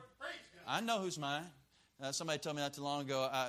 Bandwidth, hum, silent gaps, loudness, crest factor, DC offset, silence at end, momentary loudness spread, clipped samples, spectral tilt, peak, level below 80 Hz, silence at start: 15.5 kHz; none; none; -40 LUFS; 20 dB; under 0.1%; 0 s; 10 LU; under 0.1%; -3.5 dB/octave; -20 dBFS; -78 dBFS; 0 s